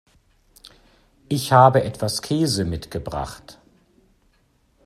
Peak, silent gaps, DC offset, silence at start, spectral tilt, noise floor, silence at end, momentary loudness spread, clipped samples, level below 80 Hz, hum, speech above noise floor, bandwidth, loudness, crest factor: -2 dBFS; none; under 0.1%; 1.3 s; -5.5 dB/octave; -62 dBFS; 1.35 s; 16 LU; under 0.1%; -48 dBFS; none; 43 dB; 14 kHz; -20 LUFS; 22 dB